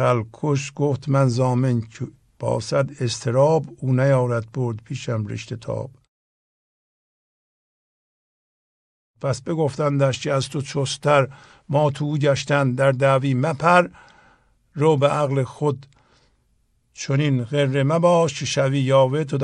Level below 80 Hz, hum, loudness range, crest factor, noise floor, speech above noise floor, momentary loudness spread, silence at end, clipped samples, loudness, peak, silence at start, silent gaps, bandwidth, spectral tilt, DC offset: -60 dBFS; none; 11 LU; 20 dB; -64 dBFS; 44 dB; 12 LU; 0 s; under 0.1%; -21 LUFS; -2 dBFS; 0 s; 6.08-9.14 s; 10.5 kHz; -6 dB/octave; under 0.1%